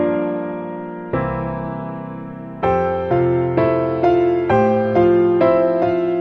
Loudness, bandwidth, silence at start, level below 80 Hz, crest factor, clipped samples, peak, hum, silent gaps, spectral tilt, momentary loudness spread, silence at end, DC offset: -18 LUFS; 5.2 kHz; 0 s; -44 dBFS; 14 dB; under 0.1%; -4 dBFS; none; none; -9.5 dB/octave; 14 LU; 0 s; under 0.1%